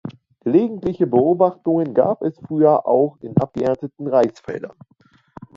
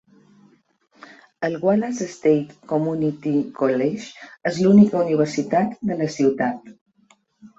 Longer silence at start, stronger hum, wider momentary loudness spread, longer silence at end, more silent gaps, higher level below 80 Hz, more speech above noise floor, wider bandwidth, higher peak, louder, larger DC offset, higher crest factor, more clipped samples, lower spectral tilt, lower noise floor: second, 0.05 s vs 1.4 s; neither; about the same, 13 LU vs 12 LU; about the same, 0.1 s vs 0.1 s; second, none vs 6.81-6.86 s; first, -56 dBFS vs -64 dBFS; second, 27 dB vs 40 dB; about the same, 7.4 kHz vs 7.8 kHz; about the same, -2 dBFS vs -4 dBFS; about the same, -19 LUFS vs -21 LUFS; neither; about the same, 18 dB vs 18 dB; neither; first, -9.5 dB/octave vs -7 dB/octave; second, -45 dBFS vs -60 dBFS